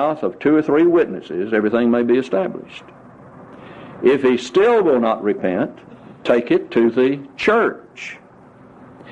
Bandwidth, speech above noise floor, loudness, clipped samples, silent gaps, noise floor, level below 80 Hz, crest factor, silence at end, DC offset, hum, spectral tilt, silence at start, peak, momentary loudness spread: 8.4 kHz; 28 dB; -17 LUFS; under 0.1%; none; -45 dBFS; -58 dBFS; 16 dB; 0 s; under 0.1%; none; -6.5 dB/octave; 0 s; -2 dBFS; 18 LU